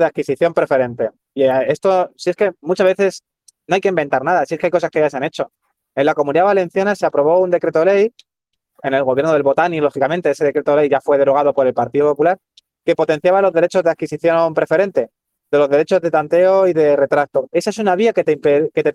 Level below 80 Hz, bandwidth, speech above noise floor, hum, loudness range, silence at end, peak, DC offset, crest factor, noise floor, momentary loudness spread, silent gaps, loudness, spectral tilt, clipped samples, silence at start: -64 dBFS; 11.5 kHz; 61 dB; none; 2 LU; 0 s; -2 dBFS; under 0.1%; 14 dB; -76 dBFS; 6 LU; none; -16 LUFS; -6 dB/octave; under 0.1%; 0 s